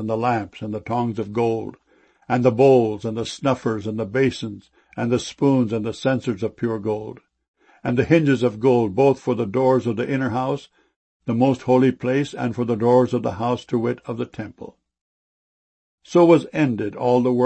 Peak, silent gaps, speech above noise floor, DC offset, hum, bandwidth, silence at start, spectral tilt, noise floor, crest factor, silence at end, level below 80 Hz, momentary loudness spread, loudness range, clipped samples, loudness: -2 dBFS; 7.48-7.54 s, 10.96-11.20 s, 15.01-15.98 s; over 70 dB; under 0.1%; none; 8.8 kHz; 0 s; -7.5 dB/octave; under -90 dBFS; 18 dB; 0 s; -58 dBFS; 13 LU; 4 LU; under 0.1%; -21 LUFS